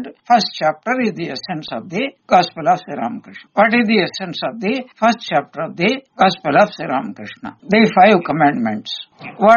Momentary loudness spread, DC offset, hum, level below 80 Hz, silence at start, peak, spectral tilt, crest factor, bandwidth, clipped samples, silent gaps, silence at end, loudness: 13 LU; under 0.1%; none; -60 dBFS; 0 s; 0 dBFS; -3.5 dB/octave; 16 dB; 7 kHz; under 0.1%; none; 0 s; -17 LUFS